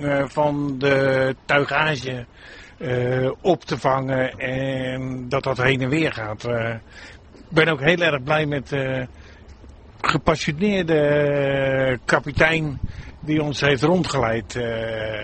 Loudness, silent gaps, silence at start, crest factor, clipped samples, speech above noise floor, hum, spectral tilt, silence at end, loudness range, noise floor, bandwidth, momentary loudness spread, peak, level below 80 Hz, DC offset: -21 LUFS; none; 0 s; 20 dB; under 0.1%; 22 dB; none; -6 dB/octave; 0 s; 3 LU; -44 dBFS; 8.8 kHz; 11 LU; -2 dBFS; -44 dBFS; under 0.1%